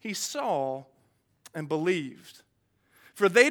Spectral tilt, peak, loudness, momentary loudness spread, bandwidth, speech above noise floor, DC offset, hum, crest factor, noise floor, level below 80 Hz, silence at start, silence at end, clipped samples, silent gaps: -3.5 dB/octave; -4 dBFS; -28 LUFS; 18 LU; 18.5 kHz; 42 dB; under 0.1%; none; 24 dB; -69 dBFS; -82 dBFS; 0.05 s; 0 s; under 0.1%; none